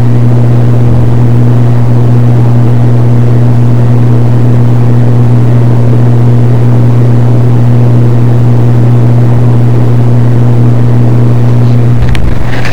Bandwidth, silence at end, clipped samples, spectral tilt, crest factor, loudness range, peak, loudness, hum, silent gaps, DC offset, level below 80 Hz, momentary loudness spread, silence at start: 5.2 kHz; 0 s; under 0.1%; -9.5 dB/octave; 8 dB; 0 LU; 0 dBFS; -6 LUFS; none; none; 40%; -22 dBFS; 1 LU; 0 s